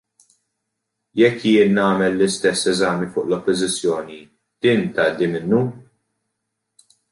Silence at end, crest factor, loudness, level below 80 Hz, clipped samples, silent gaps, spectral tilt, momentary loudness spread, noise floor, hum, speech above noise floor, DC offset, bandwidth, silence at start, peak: 1.3 s; 16 dB; -19 LUFS; -58 dBFS; under 0.1%; none; -5 dB/octave; 8 LU; -78 dBFS; none; 60 dB; under 0.1%; 11.5 kHz; 1.15 s; -4 dBFS